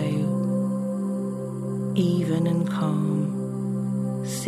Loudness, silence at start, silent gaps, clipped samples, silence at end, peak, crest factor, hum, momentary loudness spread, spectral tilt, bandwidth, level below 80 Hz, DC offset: -26 LUFS; 0 s; none; under 0.1%; 0 s; -10 dBFS; 14 dB; none; 6 LU; -7.5 dB/octave; 14 kHz; -70 dBFS; under 0.1%